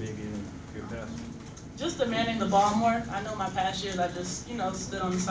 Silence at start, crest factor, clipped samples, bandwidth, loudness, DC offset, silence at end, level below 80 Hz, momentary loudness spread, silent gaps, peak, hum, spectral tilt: 0 s; 18 dB; under 0.1%; 8 kHz; -30 LUFS; under 0.1%; 0 s; -50 dBFS; 16 LU; none; -12 dBFS; none; -4.5 dB/octave